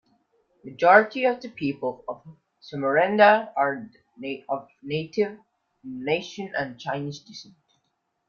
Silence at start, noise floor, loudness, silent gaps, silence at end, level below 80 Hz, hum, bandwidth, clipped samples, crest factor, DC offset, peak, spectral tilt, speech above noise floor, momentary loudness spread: 0.65 s; -75 dBFS; -24 LUFS; none; 0.85 s; -70 dBFS; none; 7 kHz; under 0.1%; 22 dB; under 0.1%; -2 dBFS; -6 dB/octave; 51 dB; 22 LU